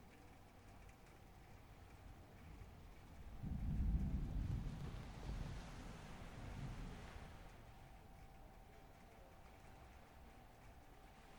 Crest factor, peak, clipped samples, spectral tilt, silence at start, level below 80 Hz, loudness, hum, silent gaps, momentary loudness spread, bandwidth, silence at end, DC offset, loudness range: 22 dB; -30 dBFS; under 0.1%; -7 dB/octave; 0 s; -52 dBFS; -51 LUFS; none; none; 18 LU; 19.5 kHz; 0 s; under 0.1%; 15 LU